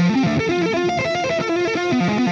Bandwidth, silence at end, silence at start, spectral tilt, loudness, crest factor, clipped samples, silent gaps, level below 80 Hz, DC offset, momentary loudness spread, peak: 7.8 kHz; 0 s; 0 s; -6 dB/octave; -19 LUFS; 10 dB; under 0.1%; none; -50 dBFS; under 0.1%; 2 LU; -8 dBFS